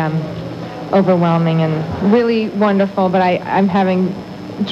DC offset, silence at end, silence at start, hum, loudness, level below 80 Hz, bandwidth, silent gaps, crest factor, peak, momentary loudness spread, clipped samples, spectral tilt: under 0.1%; 0 s; 0 s; none; -15 LUFS; -50 dBFS; 7.2 kHz; none; 14 dB; 0 dBFS; 13 LU; under 0.1%; -8.5 dB/octave